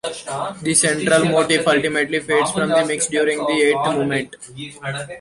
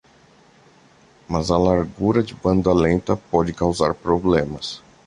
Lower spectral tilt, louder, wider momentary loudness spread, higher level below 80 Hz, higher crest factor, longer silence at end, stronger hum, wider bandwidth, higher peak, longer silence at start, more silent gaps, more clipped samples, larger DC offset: second, -3.5 dB/octave vs -6.5 dB/octave; about the same, -18 LUFS vs -20 LUFS; first, 12 LU vs 8 LU; second, -56 dBFS vs -38 dBFS; about the same, 18 dB vs 20 dB; second, 0 s vs 0.3 s; neither; about the same, 11.5 kHz vs 11 kHz; about the same, -2 dBFS vs -2 dBFS; second, 0.05 s vs 1.3 s; neither; neither; neither